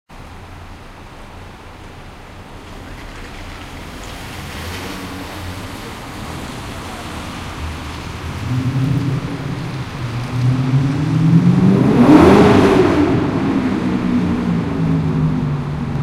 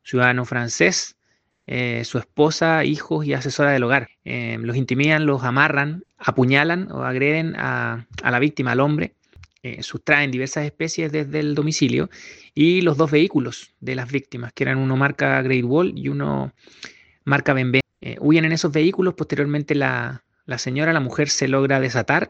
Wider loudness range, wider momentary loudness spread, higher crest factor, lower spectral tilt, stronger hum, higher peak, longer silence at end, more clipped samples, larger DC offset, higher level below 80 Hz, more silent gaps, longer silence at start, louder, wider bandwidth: first, 21 LU vs 2 LU; first, 24 LU vs 13 LU; about the same, 16 dB vs 20 dB; first, -7.5 dB/octave vs -5.5 dB/octave; neither; about the same, 0 dBFS vs 0 dBFS; about the same, 0 s vs 0 s; neither; neither; first, -36 dBFS vs -56 dBFS; neither; about the same, 0.1 s vs 0.05 s; first, -16 LUFS vs -20 LUFS; first, 15 kHz vs 8.4 kHz